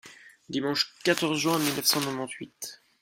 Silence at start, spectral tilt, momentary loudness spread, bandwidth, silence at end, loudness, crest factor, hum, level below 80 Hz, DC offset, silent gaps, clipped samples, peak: 0.05 s; -3 dB/octave; 15 LU; 16.5 kHz; 0.25 s; -27 LUFS; 22 dB; none; -70 dBFS; under 0.1%; none; under 0.1%; -8 dBFS